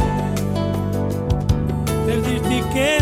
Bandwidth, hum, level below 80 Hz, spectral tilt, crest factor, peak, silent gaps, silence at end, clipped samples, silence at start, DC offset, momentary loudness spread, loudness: 16 kHz; 50 Hz at -40 dBFS; -30 dBFS; -6 dB/octave; 14 dB; -4 dBFS; none; 0 s; under 0.1%; 0 s; under 0.1%; 3 LU; -21 LUFS